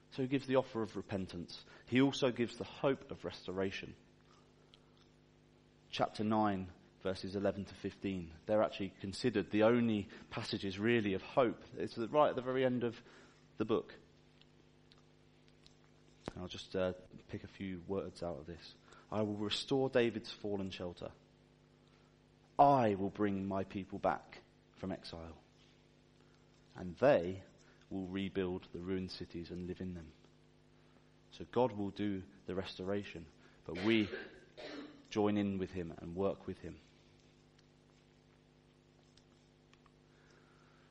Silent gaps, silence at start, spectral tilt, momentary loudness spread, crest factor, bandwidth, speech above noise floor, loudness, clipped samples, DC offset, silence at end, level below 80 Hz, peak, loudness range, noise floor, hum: none; 0.1 s; -6.5 dB/octave; 18 LU; 24 dB; 10.5 kHz; 30 dB; -37 LUFS; under 0.1%; under 0.1%; 4.1 s; -68 dBFS; -14 dBFS; 10 LU; -67 dBFS; none